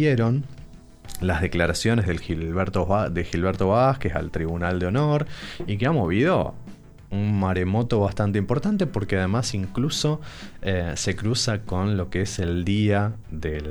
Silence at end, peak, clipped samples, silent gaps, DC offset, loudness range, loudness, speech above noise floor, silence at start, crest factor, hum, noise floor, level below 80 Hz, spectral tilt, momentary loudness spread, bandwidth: 0 s; -6 dBFS; under 0.1%; none; under 0.1%; 2 LU; -24 LUFS; 20 dB; 0 s; 18 dB; none; -43 dBFS; -40 dBFS; -6 dB/octave; 9 LU; 19 kHz